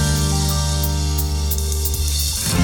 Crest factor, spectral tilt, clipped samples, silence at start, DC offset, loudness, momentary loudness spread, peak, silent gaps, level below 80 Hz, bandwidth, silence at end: 14 dB; -4 dB/octave; under 0.1%; 0 s; under 0.1%; -19 LUFS; 2 LU; -6 dBFS; none; -22 dBFS; 20 kHz; 0 s